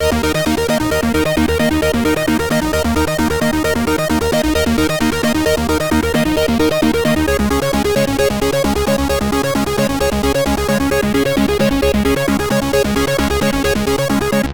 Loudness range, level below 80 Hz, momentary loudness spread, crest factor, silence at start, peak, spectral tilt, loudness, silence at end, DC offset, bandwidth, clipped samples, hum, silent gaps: 1 LU; -28 dBFS; 2 LU; 12 dB; 0 s; -4 dBFS; -5 dB/octave; -15 LUFS; 0 s; under 0.1%; 19.5 kHz; under 0.1%; none; none